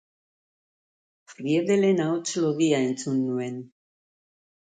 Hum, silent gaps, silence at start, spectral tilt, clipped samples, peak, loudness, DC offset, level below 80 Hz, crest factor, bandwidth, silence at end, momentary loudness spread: none; none; 1.3 s; -5.5 dB/octave; under 0.1%; -10 dBFS; -25 LUFS; under 0.1%; -74 dBFS; 16 dB; 9.6 kHz; 1 s; 12 LU